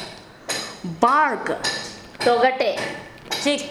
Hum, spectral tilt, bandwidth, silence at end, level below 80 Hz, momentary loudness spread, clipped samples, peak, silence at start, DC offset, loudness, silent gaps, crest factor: none; -3 dB/octave; 15.5 kHz; 0 s; -58 dBFS; 16 LU; under 0.1%; -2 dBFS; 0 s; under 0.1%; -22 LUFS; none; 22 dB